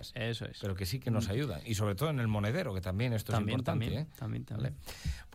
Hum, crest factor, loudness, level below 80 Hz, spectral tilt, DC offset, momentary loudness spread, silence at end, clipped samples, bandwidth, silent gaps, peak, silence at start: none; 16 dB; -35 LUFS; -50 dBFS; -6 dB/octave; under 0.1%; 7 LU; 0 s; under 0.1%; 16 kHz; none; -18 dBFS; 0 s